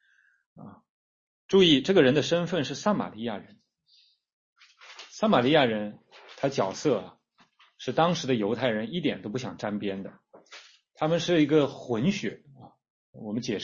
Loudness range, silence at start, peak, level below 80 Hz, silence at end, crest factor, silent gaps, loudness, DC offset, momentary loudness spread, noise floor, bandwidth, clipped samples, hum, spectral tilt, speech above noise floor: 4 LU; 0.6 s; -6 dBFS; -66 dBFS; 0 s; 22 dB; 0.89-1.49 s, 4.33-4.56 s, 12.90-13.13 s; -26 LUFS; under 0.1%; 17 LU; -64 dBFS; 7.6 kHz; under 0.1%; none; -5.5 dB/octave; 38 dB